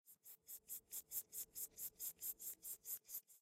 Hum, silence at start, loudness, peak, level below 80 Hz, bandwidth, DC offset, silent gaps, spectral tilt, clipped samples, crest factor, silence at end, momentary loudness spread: none; 0.05 s; -49 LUFS; -30 dBFS; -86 dBFS; 16 kHz; under 0.1%; none; 1 dB/octave; under 0.1%; 22 dB; 0 s; 9 LU